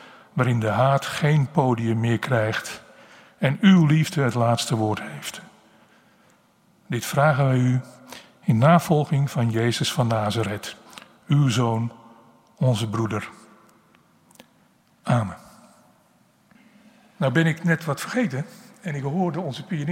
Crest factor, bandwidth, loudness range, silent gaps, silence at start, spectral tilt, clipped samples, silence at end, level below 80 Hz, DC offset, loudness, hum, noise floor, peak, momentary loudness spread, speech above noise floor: 20 dB; 16 kHz; 9 LU; none; 0 s; -6.5 dB/octave; under 0.1%; 0 s; -62 dBFS; under 0.1%; -22 LUFS; none; -60 dBFS; -2 dBFS; 16 LU; 39 dB